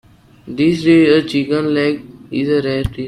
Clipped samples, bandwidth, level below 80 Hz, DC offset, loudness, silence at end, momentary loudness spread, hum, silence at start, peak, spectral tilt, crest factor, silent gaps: under 0.1%; 11 kHz; -38 dBFS; under 0.1%; -15 LUFS; 0 s; 13 LU; none; 0.45 s; 0 dBFS; -7 dB/octave; 14 dB; none